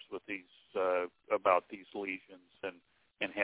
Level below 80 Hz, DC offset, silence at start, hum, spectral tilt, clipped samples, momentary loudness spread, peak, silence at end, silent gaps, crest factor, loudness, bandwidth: -78 dBFS; under 0.1%; 0.1 s; none; -1.5 dB/octave; under 0.1%; 15 LU; -12 dBFS; 0 s; none; 24 dB; -36 LUFS; 4 kHz